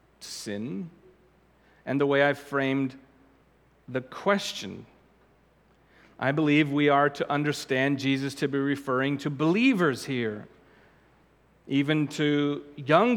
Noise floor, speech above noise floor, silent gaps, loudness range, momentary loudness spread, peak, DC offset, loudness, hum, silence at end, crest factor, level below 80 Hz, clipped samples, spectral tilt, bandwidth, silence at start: -62 dBFS; 36 dB; none; 6 LU; 14 LU; -6 dBFS; under 0.1%; -26 LUFS; none; 0 s; 22 dB; -68 dBFS; under 0.1%; -6 dB/octave; 16 kHz; 0.2 s